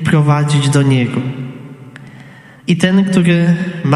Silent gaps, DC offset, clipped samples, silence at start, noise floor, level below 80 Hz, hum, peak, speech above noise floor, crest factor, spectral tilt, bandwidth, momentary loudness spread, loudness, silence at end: none; under 0.1%; under 0.1%; 0 s; -38 dBFS; -50 dBFS; none; 0 dBFS; 26 dB; 14 dB; -6.5 dB/octave; 12 kHz; 17 LU; -13 LUFS; 0 s